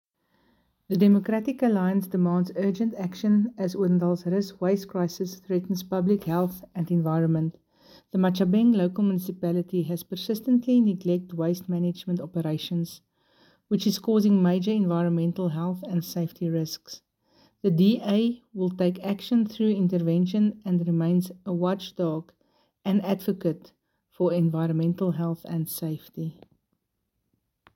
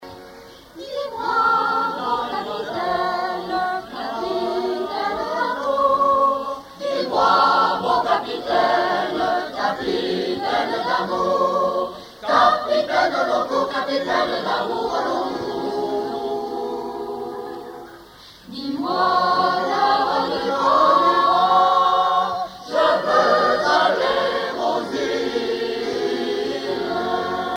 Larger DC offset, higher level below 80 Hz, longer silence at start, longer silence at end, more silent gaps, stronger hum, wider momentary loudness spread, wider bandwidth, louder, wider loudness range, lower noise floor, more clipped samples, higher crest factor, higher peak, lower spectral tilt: neither; second, -68 dBFS vs -56 dBFS; first, 0.9 s vs 0 s; first, 1.45 s vs 0 s; neither; neither; second, 9 LU vs 12 LU; about the same, 17 kHz vs 16.5 kHz; second, -26 LUFS vs -20 LUFS; second, 4 LU vs 7 LU; first, -79 dBFS vs -44 dBFS; neither; about the same, 16 dB vs 18 dB; second, -10 dBFS vs -4 dBFS; first, -7.5 dB/octave vs -4 dB/octave